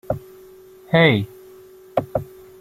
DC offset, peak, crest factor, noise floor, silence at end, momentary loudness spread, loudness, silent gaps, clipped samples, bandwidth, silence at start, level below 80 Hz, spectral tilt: under 0.1%; -2 dBFS; 22 dB; -45 dBFS; 0.4 s; 16 LU; -20 LUFS; none; under 0.1%; 15.5 kHz; 0.1 s; -50 dBFS; -7.5 dB/octave